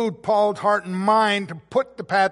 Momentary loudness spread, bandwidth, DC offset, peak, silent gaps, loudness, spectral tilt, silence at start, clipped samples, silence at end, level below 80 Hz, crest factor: 7 LU; 11.5 kHz; under 0.1%; -6 dBFS; none; -21 LUFS; -5 dB/octave; 0 s; under 0.1%; 0 s; -66 dBFS; 16 dB